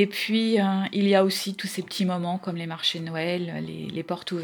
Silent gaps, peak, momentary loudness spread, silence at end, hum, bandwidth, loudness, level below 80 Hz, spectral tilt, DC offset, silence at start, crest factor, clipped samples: none; -6 dBFS; 11 LU; 0 s; none; over 20 kHz; -26 LUFS; -72 dBFS; -5 dB/octave; under 0.1%; 0 s; 18 dB; under 0.1%